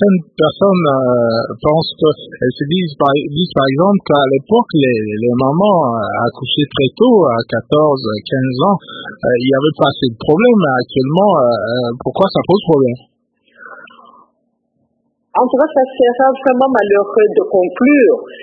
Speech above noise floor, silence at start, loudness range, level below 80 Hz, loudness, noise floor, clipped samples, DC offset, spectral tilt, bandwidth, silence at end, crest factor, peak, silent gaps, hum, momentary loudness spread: 52 dB; 0 s; 5 LU; -50 dBFS; -13 LUFS; -64 dBFS; under 0.1%; under 0.1%; -9.5 dB/octave; 4.8 kHz; 0 s; 14 dB; 0 dBFS; none; none; 7 LU